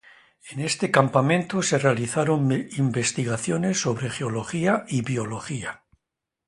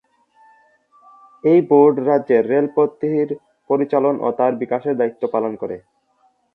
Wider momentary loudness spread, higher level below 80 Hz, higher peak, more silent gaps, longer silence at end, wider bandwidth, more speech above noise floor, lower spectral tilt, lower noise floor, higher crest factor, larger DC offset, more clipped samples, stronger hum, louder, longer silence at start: about the same, 10 LU vs 12 LU; first, -60 dBFS vs -68 dBFS; about the same, -2 dBFS vs -2 dBFS; neither; about the same, 0.7 s vs 0.75 s; first, 11.5 kHz vs 4.2 kHz; first, 61 dB vs 44 dB; second, -5 dB/octave vs -10.5 dB/octave; first, -84 dBFS vs -61 dBFS; first, 22 dB vs 16 dB; neither; neither; neither; second, -24 LUFS vs -18 LUFS; second, 0.45 s vs 1.45 s